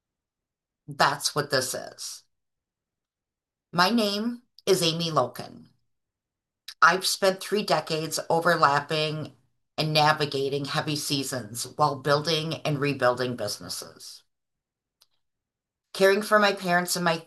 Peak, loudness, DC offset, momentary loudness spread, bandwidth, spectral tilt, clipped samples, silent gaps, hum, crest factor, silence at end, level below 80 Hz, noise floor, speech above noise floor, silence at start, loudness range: -4 dBFS; -25 LUFS; under 0.1%; 16 LU; 13 kHz; -3.5 dB/octave; under 0.1%; none; none; 22 dB; 0.05 s; -72 dBFS; -90 dBFS; 65 dB; 0.9 s; 6 LU